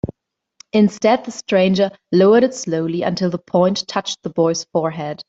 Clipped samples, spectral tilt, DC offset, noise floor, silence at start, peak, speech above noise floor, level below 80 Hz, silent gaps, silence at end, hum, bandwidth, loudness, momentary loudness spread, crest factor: under 0.1%; -5.5 dB/octave; under 0.1%; -62 dBFS; 0.05 s; -2 dBFS; 45 dB; -54 dBFS; none; 0.05 s; none; 7.8 kHz; -18 LUFS; 9 LU; 14 dB